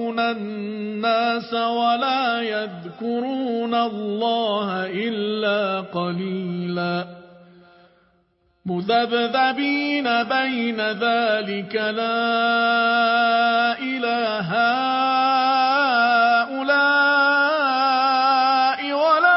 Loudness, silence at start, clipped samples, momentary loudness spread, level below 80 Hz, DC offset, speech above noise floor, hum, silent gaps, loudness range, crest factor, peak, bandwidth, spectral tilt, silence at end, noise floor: -20 LUFS; 0 s; under 0.1%; 9 LU; -72 dBFS; under 0.1%; 43 dB; none; none; 8 LU; 16 dB; -4 dBFS; 5.8 kHz; -8.5 dB/octave; 0 s; -64 dBFS